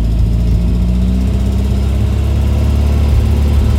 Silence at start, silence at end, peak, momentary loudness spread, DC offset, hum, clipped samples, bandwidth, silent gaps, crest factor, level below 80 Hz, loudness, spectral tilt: 0 s; 0 s; -2 dBFS; 2 LU; under 0.1%; none; under 0.1%; 11.5 kHz; none; 10 dB; -12 dBFS; -14 LUFS; -8 dB/octave